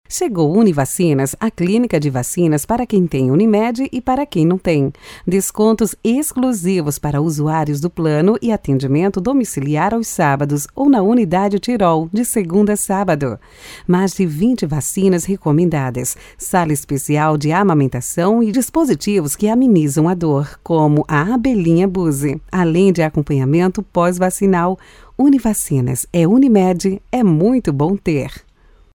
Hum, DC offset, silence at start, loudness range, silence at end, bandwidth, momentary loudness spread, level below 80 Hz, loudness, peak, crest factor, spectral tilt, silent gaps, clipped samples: none; under 0.1%; 0.1 s; 2 LU; 0.55 s; 19 kHz; 6 LU; -42 dBFS; -16 LUFS; 0 dBFS; 14 dB; -6.5 dB/octave; none; under 0.1%